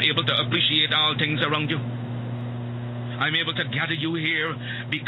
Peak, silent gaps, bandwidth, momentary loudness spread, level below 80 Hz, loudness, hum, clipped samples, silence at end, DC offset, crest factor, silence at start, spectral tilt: -4 dBFS; none; 5.4 kHz; 12 LU; -60 dBFS; -23 LUFS; none; under 0.1%; 0 s; under 0.1%; 20 dB; 0 s; -7 dB/octave